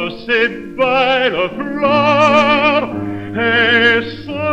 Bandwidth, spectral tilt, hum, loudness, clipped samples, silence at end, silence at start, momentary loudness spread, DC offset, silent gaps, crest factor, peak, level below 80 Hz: 8.8 kHz; -5 dB/octave; none; -13 LUFS; under 0.1%; 0 s; 0 s; 11 LU; under 0.1%; none; 14 dB; 0 dBFS; -46 dBFS